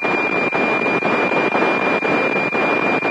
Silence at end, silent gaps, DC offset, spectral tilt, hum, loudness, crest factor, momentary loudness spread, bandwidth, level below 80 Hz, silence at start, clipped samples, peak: 0 s; none; under 0.1%; -5.5 dB/octave; none; -17 LUFS; 14 dB; 1 LU; 10.5 kHz; -64 dBFS; 0 s; under 0.1%; -4 dBFS